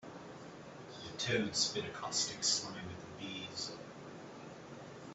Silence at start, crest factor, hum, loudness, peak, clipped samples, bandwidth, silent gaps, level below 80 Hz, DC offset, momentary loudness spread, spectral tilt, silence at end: 0 s; 24 dB; none; -37 LUFS; -18 dBFS; under 0.1%; 8.2 kHz; none; -72 dBFS; under 0.1%; 18 LU; -2 dB/octave; 0 s